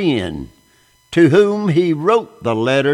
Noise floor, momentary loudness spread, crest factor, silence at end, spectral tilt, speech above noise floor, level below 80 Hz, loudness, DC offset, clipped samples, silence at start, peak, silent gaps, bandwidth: -54 dBFS; 10 LU; 14 dB; 0 s; -7 dB/octave; 40 dB; -48 dBFS; -15 LUFS; under 0.1%; under 0.1%; 0 s; -2 dBFS; none; 10.5 kHz